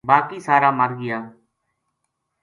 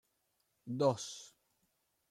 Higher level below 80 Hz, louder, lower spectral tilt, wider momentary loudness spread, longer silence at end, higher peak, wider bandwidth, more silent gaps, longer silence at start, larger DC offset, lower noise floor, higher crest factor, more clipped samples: first, -68 dBFS vs -84 dBFS; first, -19 LUFS vs -36 LUFS; about the same, -6.5 dB/octave vs -5.5 dB/octave; second, 11 LU vs 22 LU; first, 1.1 s vs 0.8 s; first, 0 dBFS vs -18 dBFS; second, 11 kHz vs 14 kHz; neither; second, 0.05 s vs 0.65 s; neither; second, -76 dBFS vs -81 dBFS; about the same, 22 dB vs 24 dB; neither